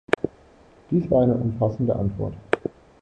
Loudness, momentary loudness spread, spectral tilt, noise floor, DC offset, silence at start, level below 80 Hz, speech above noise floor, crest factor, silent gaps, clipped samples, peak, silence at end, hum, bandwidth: -24 LUFS; 11 LU; -9 dB/octave; -52 dBFS; under 0.1%; 0.1 s; -46 dBFS; 30 dB; 22 dB; none; under 0.1%; -2 dBFS; 0.3 s; none; 9.2 kHz